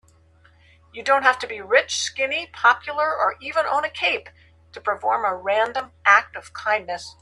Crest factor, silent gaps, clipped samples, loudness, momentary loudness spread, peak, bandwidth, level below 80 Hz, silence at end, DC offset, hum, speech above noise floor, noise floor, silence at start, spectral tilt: 22 dB; none; under 0.1%; -21 LUFS; 11 LU; 0 dBFS; 12 kHz; -62 dBFS; 0.1 s; under 0.1%; none; 33 dB; -55 dBFS; 0.95 s; -1 dB/octave